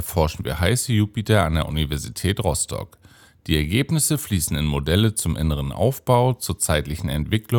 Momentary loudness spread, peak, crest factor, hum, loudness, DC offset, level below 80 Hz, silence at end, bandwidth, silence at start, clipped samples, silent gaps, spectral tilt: 6 LU; -2 dBFS; 18 dB; none; -22 LUFS; under 0.1%; -34 dBFS; 0 s; 18 kHz; 0 s; under 0.1%; none; -5 dB/octave